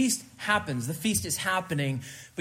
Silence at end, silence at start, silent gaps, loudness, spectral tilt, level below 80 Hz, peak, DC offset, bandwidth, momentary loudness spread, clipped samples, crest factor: 0 s; 0 s; none; -28 LUFS; -3.5 dB/octave; -60 dBFS; -10 dBFS; under 0.1%; 16 kHz; 6 LU; under 0.1%; 18 dB